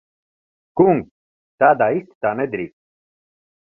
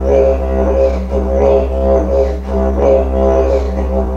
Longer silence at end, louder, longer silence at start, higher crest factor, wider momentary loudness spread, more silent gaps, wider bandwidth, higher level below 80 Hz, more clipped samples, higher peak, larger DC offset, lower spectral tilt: first, 1.1 s vs 0 s; second, -18 LUFS vs -13 LUFS; first, 0.75 s vs 0 s; first, 20 dB vs 12 dB; first, 14 LU vs 5 LU; first, 1.11-1.58 s, 2.15-2.21 s vs none; second, 3 kHz vs 6.8 kHz; second, -60 dBFS vs -18 dBFS; neither; about the same, -2 dBFS vs 0 dBFS; neither; first, -11 dB/octave vs -9 dB/octave